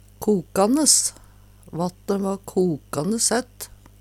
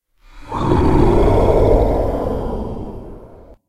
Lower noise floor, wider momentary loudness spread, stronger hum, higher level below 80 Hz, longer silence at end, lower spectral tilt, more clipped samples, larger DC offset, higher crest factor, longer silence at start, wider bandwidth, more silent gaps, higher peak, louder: first, -48 dBFS vs -40 dBFS; about the same, 18 LU vs 17 LU; first, 50 Hz at -50 dBFS vs none; second, -52 dBFS vs -22 dBFS; first, 0.35 s vs 0.15 s; second, -3.5 dB/octave vs -9 dB/octave; neither; neither; about the same, 20 dB vs 16 dB; second, 0.2 s vs 0.35 s; first, 17 kHz vs 13.5 kHz; neither; about the same, -2 dBFS vs 0 dBFS; second, -21 LUFS vs -16 LUFS